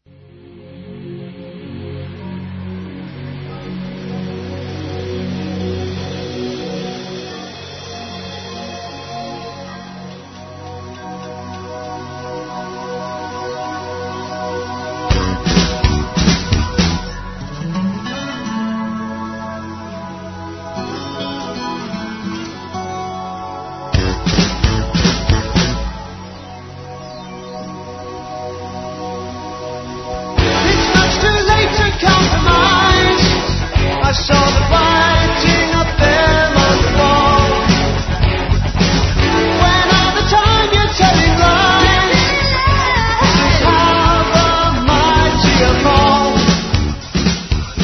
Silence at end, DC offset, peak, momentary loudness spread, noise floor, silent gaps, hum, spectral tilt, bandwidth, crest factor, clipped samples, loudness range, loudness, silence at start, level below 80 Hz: 0 s; under 0.1%; 0 dBFS; 18 LU; -41 dBFS; none; none; -4.5 dB/octave; 6.4 kHz; 16 dB; under 0.1%; 17 LU; -14 LUFS; 0.45 s; -24 dBFS